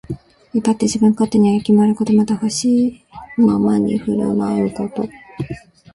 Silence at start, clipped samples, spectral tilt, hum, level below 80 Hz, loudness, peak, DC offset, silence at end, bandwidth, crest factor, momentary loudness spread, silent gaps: 0.1 s; under 0.1%; -6.5 dB/octave; none; -48 dBFS; -17 LUFS; -2 dBFS; under 0.1%; 0.35 s; 11.5 kHz; 14 dB; 15 LU; none